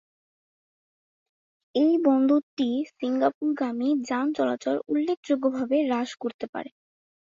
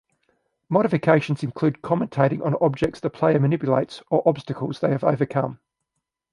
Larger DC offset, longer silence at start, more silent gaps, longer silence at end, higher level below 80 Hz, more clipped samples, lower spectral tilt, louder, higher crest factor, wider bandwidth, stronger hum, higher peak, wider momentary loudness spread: neither; first, 1.75 s vs 0.7 s; first, 2.43-2.57 s, 3.34-3.41 s, 5.17-5.23 s, 6.34-6.39 s, 6.49-6.53 s vs none; second, 0.6 s vs 0.75 s; second, -74 dBFS vs -56 dBFS; neither; second, -5 dB/octave vs -8.5 dB/octave; second, -26 LUFS vs -22 LUFS; about the same, 18 dB vs 20 dB; second, 7.6 kHz vs 11 kHz; neither; second, -8 dBFS vs -2 dBFS; first, 11 LU vs 6 LU